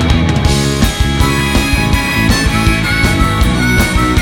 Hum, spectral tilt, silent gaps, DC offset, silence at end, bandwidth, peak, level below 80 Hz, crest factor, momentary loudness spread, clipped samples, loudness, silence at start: none; -4.5 dB/octave; none; under 0.1%; 0 s; 18 kHz; 0 dBFS; -18 dBFS; 10 dB; 1 LU; under 0.1%; -12 LUFS; 0 s